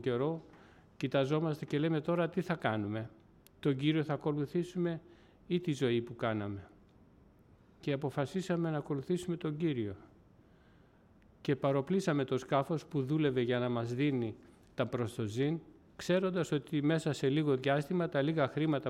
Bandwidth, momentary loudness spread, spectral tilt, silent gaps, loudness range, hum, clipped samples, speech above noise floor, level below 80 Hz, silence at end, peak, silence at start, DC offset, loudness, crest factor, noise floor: 13.5 kHz; 9 LU; -7 dB/octave; none; 5 LU; none; under 0.1%; 30 dB; -68 dBFS; 0 s; -18 dBFS; 0 s; under 0.1%; -34 LUFS; 18 dB; -63 dBFS